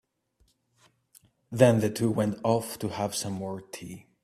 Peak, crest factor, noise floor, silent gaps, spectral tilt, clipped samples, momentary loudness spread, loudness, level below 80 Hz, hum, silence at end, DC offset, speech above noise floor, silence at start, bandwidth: -6 dBFS; 24 dB; -69 dBFS; none; -6 dB/octave; under 0.1%; 18 LU; -27 LUFS; -64 dBFS; none; 0.25 s; under 0.1%; 43 dB; 1.5 s; 15 kHz